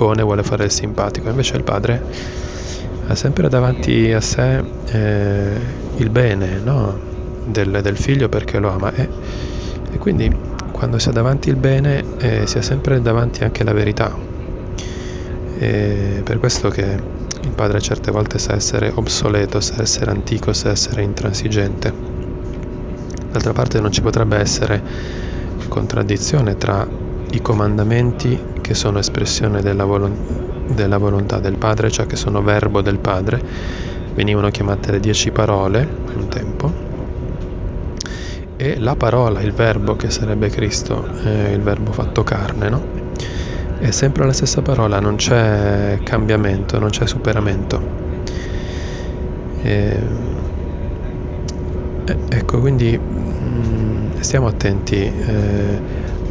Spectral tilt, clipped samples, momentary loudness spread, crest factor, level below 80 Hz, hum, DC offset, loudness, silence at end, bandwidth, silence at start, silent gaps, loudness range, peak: -5.5 dB/octave; under 0.1%; 10 LU; 18 dB; -26 dBFS; none; under 0.1%; -18 LUFS; 0 s; 8 kHz; 0 s; none; 4 LU; 0 dBFS